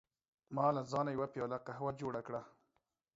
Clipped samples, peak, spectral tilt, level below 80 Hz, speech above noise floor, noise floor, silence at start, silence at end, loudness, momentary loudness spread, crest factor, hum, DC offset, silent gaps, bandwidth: under 0.1%; -22 dBFS; -6.5 dB/octave; -74 dBFS; 45 dB; -84 dBFS; 0.5 s; 0.65 s; -39 LUFS; 10 LU; 20 dB; none; under 0.1%; none; 7.6 kHz